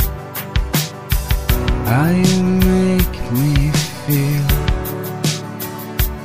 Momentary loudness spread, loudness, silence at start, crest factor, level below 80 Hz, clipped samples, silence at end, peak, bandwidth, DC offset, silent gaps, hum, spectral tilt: 9 LU; -18 LUFS; 0 s; 16 dB; -24 dBFS; under 0.1%; 0 s; 0 dBFS; 15.5 kHz; under 0.1%; none; none; -5.5 dB/octave